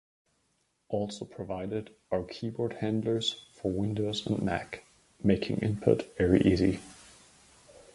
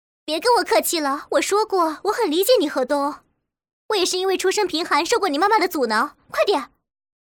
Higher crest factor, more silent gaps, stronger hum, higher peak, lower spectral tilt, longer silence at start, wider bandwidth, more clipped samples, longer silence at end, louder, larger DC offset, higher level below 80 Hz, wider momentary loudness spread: first, 22 dB vs 14 dB; second, none vs 3.73-3.89 s; neither; about the same, -8 dBFS vs -6 dBFS; first, -6.5 dB/octave vs -1.5 dB/octave; first, 0.9 s vs 0.25 s; second, 11.5 kHz vs over 20 kHz; neither; second, 0.15 s vs 0.6 s; second, -30 LUFS vs -20 LUFS; neither; first, -50 dBFS vs -62 dBFS; first, 13 LU vs 7 LU